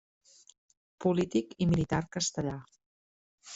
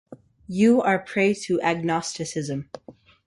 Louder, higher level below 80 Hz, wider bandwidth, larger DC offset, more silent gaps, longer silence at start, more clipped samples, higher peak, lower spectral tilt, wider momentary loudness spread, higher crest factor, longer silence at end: second, -31 LUFS vs -23 LUFS; first, -56 dBFS vs -62 dBFS; second, 8.2 kHz vs 11.5 kHz; neither; first, 2.86-3.38 s vs none; first, 1 s vs 0.1 s; neither; second, -14 dBFS vs -8 dBFS; about the same, -5.5 dB/octave vs -5.5 dB/octave; second, 8 LU vs 14 LU; about the same, 18 dB vs 16 dB; second, 0 s vs 0.35 s